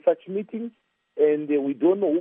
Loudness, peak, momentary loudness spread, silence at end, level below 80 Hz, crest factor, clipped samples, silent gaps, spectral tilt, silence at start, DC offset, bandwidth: -24 LUFS; -8 dBFS; 15 LU; 0 s; -86 dBFS; 16 dB; under 0.1%; none; -7 dB/octave; 0.05 s; under 0.1%; 3.7 kHz